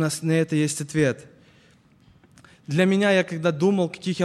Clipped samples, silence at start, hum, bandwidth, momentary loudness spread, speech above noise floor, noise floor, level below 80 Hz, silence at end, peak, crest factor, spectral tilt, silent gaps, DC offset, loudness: under 0.1%; 0 s; none; 13.5 kHz; 6 LU; 34 dB; -56 dBFS; -62 dBFS; 0 s; -8 dBFS; 16 dB; -5.5 dB/octave; none; under 0.1%; -22 LUFS